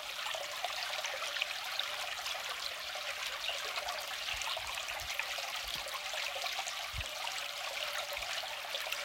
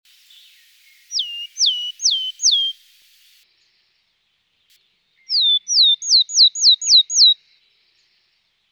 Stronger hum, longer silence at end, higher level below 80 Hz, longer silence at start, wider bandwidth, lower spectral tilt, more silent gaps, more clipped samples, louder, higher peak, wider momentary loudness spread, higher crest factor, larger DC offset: neither; second, 0 s vs 1.4 s; first, -62 dBFS vs -88 dBFS; second, 0 s vs 1.1 s; second, 17 kHz vs 19.5 kHz; first, 0.5 dB/octave vs 9.5 dB/octave; neither; neither; second, -37 LUFS vs -13 LUFS; second, -16 dBFS vs -4 dBFS; second, 2 LU vs 13 LU; first, 24 dB vs 16 dB; neither